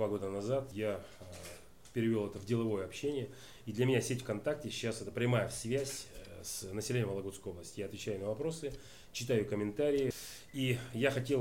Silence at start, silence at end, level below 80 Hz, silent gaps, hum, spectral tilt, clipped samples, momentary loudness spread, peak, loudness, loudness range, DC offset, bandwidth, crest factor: 0 s; 0 s; -62 dBFS; none; none; -5.5 dB/octave; under 0.1%; 13 LU; -18 dBFS; -37 LUFS; 3 LU; 0.1%; 16.5 kHz; 18 dB